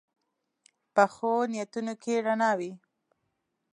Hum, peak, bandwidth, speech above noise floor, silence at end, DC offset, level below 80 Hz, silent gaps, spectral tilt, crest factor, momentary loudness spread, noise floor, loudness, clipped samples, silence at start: none; -8 dBFS; 11 kHz; 52 dB; 0.95 s; under 0.1%; -80 dBFS; none; -5 dB/octave; 22 dB; 9 LU; -80 dBFS; -28 LUFS; under 0.1%; 0.95 s